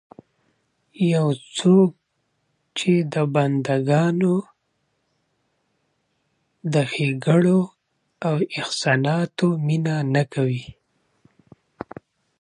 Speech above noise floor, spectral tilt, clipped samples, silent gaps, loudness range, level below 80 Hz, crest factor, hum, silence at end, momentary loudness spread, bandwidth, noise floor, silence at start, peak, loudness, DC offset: 52 dB; -6.5 dB/octave; under 0.1%; none; 5 LU; -64 dBFS; 18 dB; none; 1.7 s; 12 LU; 11 kHz; -72 dBFS; 1 s; -4 dBFS; -21 LUFS; under 0.1%